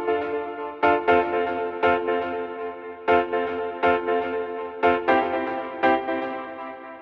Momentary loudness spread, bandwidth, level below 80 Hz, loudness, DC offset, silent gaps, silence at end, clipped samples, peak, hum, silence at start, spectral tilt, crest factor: 11 LU; 6 kHz; -58 dBFS; -24 LUFS; under 0.1%; none; 0 s; under 0.1%; -6 dBFS; none; 0 s; -7 dB/octave; 18 dB